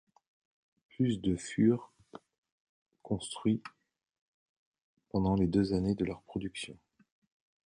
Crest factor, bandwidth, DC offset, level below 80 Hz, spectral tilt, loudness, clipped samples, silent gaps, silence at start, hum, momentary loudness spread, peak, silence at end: 20 dB; 10.5 kHz; under 0.1%; -56 dBFS; -6.5 dB/octave; -33 LUFS; under 0.1%; 2.38-2.43 s, 2.52-2.86 s, 4.21-4.72 s, 4.82-4.97 s; 1 s; none; 12 LU; -14 dBFS; 0.95 s